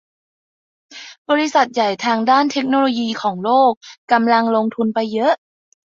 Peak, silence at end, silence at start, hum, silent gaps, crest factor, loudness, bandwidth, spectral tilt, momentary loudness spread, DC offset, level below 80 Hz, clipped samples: -2 dBFS; 0.6 s; 0.9 s; none; 1.18-1.25 s, 3.77-3.81 s, 3.98-4.08 s; 16 dB; -17 LUFS; 7.6 kHz; -4.5 dB/octave; 8 LU; under 0.1%; -66 dBFS; under 0.1%